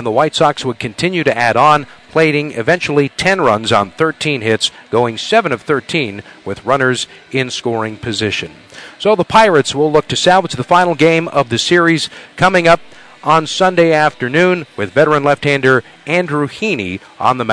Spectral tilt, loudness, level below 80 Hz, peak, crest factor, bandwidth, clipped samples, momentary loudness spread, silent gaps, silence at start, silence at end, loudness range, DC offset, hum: -4.5 dB/octave; -13 LUFS; -48 dBFS; 0 dBFS; 14 dB; 11 kHz; under 0.1%; 8 LU; none; 0 s; 0 s; 4 LU; under 0.1%; none